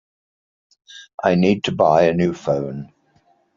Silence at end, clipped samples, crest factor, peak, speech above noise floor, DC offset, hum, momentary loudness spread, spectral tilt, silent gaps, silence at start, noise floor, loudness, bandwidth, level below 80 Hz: 0.7 s; under 0.1%; 18 dB; -2 dBFS; 42 dB; under 0.1%; none; 15 LU; -5.5 dB/octave; 1.14-1.18 s; 0.95 s; -60 dBFS; -18 LUFS; 7.4 kHz; -56 dBFS